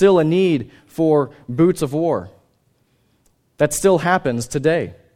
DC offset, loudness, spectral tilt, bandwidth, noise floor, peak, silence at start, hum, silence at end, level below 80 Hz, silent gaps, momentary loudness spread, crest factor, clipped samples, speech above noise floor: under 0.1%; -18 LUFS; -6 dB/octave; 16 kHz; -62 dBFS; -2 dBFS; 0 s; none; 0.25 s; -50 dBFS; none; 8 LU; 18 dB; under 0.1%; 45 dB